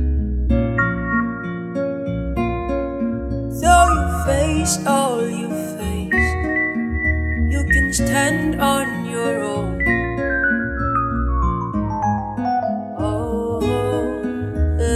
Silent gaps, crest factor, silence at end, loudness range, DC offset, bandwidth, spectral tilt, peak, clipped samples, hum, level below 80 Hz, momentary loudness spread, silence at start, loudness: none; 20 dB; 0 s; 3 LU; under 0.1%; 15 kHz; -5.5 dB/octave; 0 dBFS; under 0.1%; none; -28 dBFS; 8 LU; 0 s; -20 LUFS